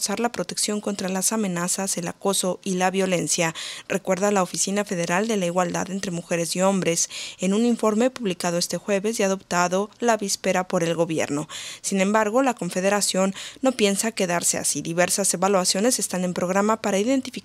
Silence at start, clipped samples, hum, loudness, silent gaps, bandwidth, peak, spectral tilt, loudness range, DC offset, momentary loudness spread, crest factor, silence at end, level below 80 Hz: 0 s; under 0.1%; none; -23 LUFS; none; 16 kHz; -4 dBFS; -3.5 dB/octave; 2 LU; under 0.1%; 6 LU; 20 dB; 0.05 s; -66 dBFS